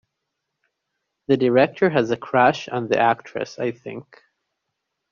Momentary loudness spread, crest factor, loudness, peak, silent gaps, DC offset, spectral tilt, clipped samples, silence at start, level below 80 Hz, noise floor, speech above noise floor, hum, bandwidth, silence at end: 18 LU; 20 dB; -20 LUFS; -4 dBFS; none; under 0.1%; -4.5 dB/octave; under 0.1%; 1.3 s; -62 dBFS; -79 dBFS; 59 dB; none; 7.2 kHz; 1.1 s